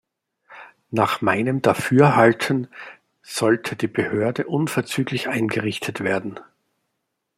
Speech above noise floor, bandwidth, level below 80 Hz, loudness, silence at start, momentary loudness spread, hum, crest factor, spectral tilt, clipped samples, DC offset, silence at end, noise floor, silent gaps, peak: 57 dB; 16 kHz; -64 dBFS; -21 LUFS; 0.5 s; 13 LU; none; 20 dB; -6 dB/octave; under 0.1%; under 0.1%; 0.95 s; -77 dBFS; none; -2 dBFS